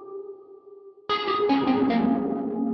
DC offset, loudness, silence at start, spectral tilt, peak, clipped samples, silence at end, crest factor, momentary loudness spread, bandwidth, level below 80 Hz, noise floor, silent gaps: under 0.1%; -24 LUFS; 0 s; -7.5 dB/octave; -10 dBFS; under 0.1%; 0 s; 14 dB; 18 LU; 6 kHz; -60 dBFS; -48 dBFS; none